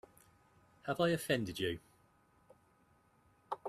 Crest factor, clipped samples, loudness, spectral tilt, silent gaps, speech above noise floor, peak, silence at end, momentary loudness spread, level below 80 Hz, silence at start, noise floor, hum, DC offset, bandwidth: 22 dB; under 0.1%; -37 LUFS; -5 dB/octave; none; 35 dB; -20 dBFS; 0 s; 14 LU; -70 dBFS; 0.85 s; -71 dBFS; none; under 0.1%; 14 kHz